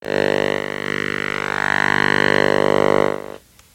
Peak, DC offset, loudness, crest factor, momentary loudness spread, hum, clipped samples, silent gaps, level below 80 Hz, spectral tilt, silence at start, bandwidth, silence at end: 0 dBFS; under 0.1%; -18 LUFS; 20 dB; 7 LU; 50 Hz at -30 dBFS; under 0.1%; none; -50 dBFS; -5 dB/octave; 0.05 s; 17 kHz; 0.35 s